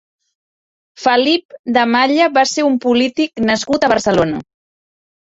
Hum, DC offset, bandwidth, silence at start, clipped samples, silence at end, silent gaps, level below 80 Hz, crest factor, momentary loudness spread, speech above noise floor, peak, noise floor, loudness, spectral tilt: none; under 0.1%; 8 kHz; 1 s; under 0.1%; 0.8 s; 1.45-1.49 s, 1.59-1.64 s; -50 dBFS; 14 dB; 6 LU; over 76 dB; -2 dBFS; under -90 dBFS; -14 LUFS; -4 dB/octave